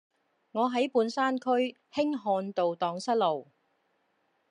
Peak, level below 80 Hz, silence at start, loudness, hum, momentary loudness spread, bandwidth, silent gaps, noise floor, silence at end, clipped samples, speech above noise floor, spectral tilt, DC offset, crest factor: -14 dBFS; -88 dBFS; 0.55 s; -29 LUFS; none; 5 LU; 10.5 kHz; none; -74 dBFS; 1.1 s; under 0.1%; 45 dB; -5 dB/octave; under 0.1%; 16 dB